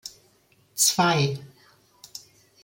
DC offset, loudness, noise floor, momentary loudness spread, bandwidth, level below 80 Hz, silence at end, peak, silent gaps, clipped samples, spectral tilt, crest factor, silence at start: under 0.1%; -21 LUFS; -62 dBFS; 23 LU; 17 kHz; -66 dBFS; 0.45 s; -6 dBFS; none; under 0.1%; -3 dB/octave; 22 dB; 0.05 s